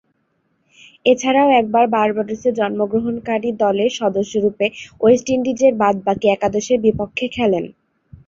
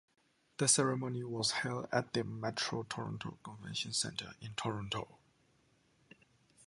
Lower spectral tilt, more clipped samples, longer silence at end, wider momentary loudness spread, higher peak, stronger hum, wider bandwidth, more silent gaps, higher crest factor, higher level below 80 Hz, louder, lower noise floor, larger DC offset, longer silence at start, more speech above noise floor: first, -5 dB/octave vs -3 dB/octave; neither; first, 0.55 s vs 0.05 s; second, 7 LU vs 14 LU; first, -2 dBFS vs -16 dBFS; neither; second, 7.8 kHz vs 11.5 kHz; neither; second, 16 dB vs 22 dB; first, -52 dBFS vs -70 dBFS; first, -17 LUFS vs -36 LUFS; second, -66 dBFS vs -72 dBFS; neither; first, 1.05 s vs 0.6 s; first, 49 dB vs 35 dB